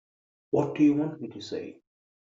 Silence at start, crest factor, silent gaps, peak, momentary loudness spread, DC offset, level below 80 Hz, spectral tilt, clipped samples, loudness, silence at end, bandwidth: 0.55 s; 16 dB; none; -12 dBFS; 15 LU; under 0.1%; -68 dBFS; -7 dB/octave; under 0.1%; -27 LUFS; 0.5 s; 7.6 kHz